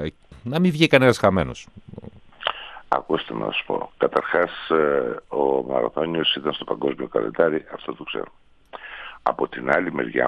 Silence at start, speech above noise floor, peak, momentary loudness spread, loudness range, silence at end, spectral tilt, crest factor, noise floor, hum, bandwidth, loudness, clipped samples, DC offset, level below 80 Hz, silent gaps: 0 s; 20 dB; -2 dBFS; 18 LU; 4 LU; 0 s; -6 dB/octave; 22 dB; -41 dBFS; none; 13.5 kHz; -22 LUFS; under 0.1%; under 0.1%; -54 dBFS; none